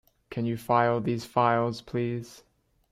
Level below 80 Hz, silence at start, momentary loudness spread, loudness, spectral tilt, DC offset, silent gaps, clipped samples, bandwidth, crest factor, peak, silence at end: -62 dBFS; 0.3 s; 12 LU; -27 LUFS; -7 dB/octave; under 0.1%; none; under 0.1%; 15.5 kHz; 18 dB; -10 dBFS; 0.55 s